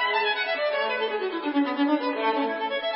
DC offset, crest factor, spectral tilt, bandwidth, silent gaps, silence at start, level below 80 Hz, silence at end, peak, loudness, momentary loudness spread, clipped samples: under 0.1%; 14 dB; -7 dB/octave; 5.8 kHz; none; 0 s; -74 dBFS; 0 s; -12 dBFS; -25 LUFS; 4 LU; under 0.1%